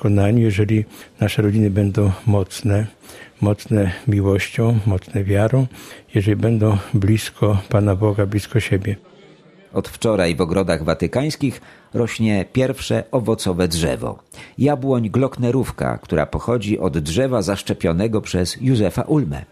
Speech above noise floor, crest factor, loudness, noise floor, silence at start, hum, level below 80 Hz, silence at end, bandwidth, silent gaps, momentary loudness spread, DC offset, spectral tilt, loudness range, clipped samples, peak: 29 dB; 18 dB; -19 LUFS; -47 dBFS; 0 s; none; -42 dBFS; 0.05 s; 14.5 kHz; none; 7 LU; under 0.1%; -7 dB/octave; 2 LU; under 0.1%; -2 dBFS